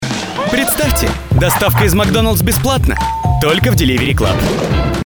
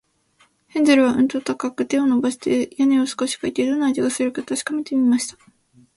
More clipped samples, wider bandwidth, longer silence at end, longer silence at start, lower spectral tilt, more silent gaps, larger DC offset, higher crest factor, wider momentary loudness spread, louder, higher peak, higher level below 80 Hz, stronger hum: neither; first, over 20 kHz vs 11.5 kHz; second, 0 s vs 0.65 s; second, 0 s vs 0.75 s; first, -5 dB/octave vs -3.5 dB/octave; neither; neither; second, 12 dB vs 18 dB; second, 4 LU vs 9 LU; first, -13 LUFS vs -20 LUFS; about the same, -2 dBFS vs -4 dBFS; first, -22 dBFS vs -62 dBFS; neither